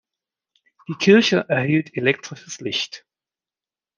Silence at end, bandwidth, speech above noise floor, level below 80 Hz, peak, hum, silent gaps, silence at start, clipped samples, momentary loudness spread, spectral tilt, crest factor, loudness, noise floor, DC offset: 1 s; 9.4 kHz; over 70 dB; -68 dBFS; -2 dBFS; none; none; 0.9 s; under 0.1%; 18 LU; -5 dB/octave; 20 dB; -19 LUFS; under -90 dBFS; under 0.1%